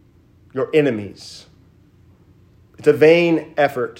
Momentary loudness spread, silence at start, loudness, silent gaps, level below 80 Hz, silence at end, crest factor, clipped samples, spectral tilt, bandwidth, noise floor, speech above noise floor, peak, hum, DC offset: 21 LU; 0.55 s; -17 LUFS; none; -62 dBFS; 0.1 s; 18 dB; under 0.1%; -6.5 dB/octave; 16 kHz; -52 dBFS; 35 dB; 0 dBFS; none; under 0.1%